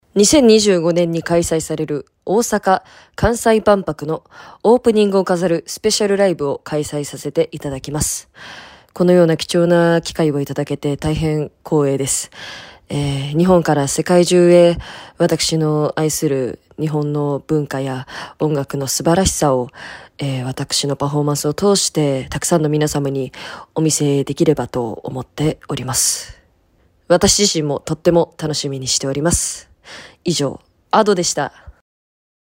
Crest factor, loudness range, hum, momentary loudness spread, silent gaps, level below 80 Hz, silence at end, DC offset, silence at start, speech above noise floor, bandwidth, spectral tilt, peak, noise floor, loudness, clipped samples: 16 dB; 4 LU; none; 13 LU; none; -40 dBFS; 0.85 s; under 0.1%; 0.15 s; 40 dB; 16.5 kHz; -4.5 dB/octave; 0 dBFS; -57 dBFS; -17 LUFS; under 0.1%